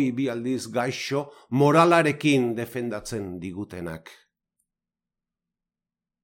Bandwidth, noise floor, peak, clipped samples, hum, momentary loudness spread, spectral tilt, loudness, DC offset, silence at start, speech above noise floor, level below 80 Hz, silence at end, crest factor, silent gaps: 17 kHz; -89 dBFS; -6 dBFS; under 0.1%; none; 17 LU; -6 dB/octave; -24 LUFS; under 0.1%; 0 s; 65 dB; -62 dBFS; 2.1 s; 20 dB; none